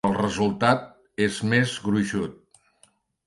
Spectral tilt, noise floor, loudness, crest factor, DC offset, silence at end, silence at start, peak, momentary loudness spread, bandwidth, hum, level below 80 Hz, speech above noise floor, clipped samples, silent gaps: -5.5 dB/octave; -62 dBFS; -24 LUFS; 22 dB; under 0.1%; 0.95 s; 0.05 s; -2 dBFS; 8 LU; 11.5 kHz; none; -54 dBFS; 39 dB; under 0.1%; none